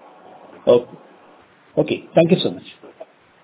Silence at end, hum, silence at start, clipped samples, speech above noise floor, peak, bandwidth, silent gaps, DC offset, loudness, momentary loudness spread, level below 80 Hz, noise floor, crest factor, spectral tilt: 0.4 s; none; 0.65 s; under 0.1%; 32 dB; 0 dBFS; 4 kHz; none; under 0.1%; -19 LUFS; 24 LU; -60 dBFS; -50 dBFS; 20 dB; -11 dB/octave